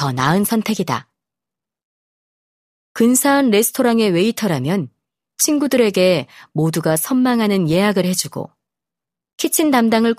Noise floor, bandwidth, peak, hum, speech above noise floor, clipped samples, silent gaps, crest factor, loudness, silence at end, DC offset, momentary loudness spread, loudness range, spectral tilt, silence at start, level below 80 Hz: -87 dBFS; 15.5 kHz; 0 dBFS; none; 71 dB; under 0.1%; 1.83-2.95 s, 9.33-9.38 s; 18 dB; -16 LUFS; 0.05 s; under 0.1%; 10 LU; 3 LU; -4.5 dB/octave; 0 s; -58 dBFS